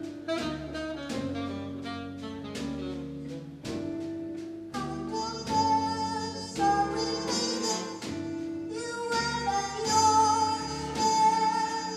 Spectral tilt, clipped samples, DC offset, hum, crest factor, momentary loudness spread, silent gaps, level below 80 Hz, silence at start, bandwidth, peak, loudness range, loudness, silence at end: -3.5 dB/octave; under 0.1%; under 0.1%; none; 18 dB; 14 LU; none; -54 dBFS; 0 s; 14.5 kHz; -12 dBFS; 10 LU; -30 LUFS; 0 s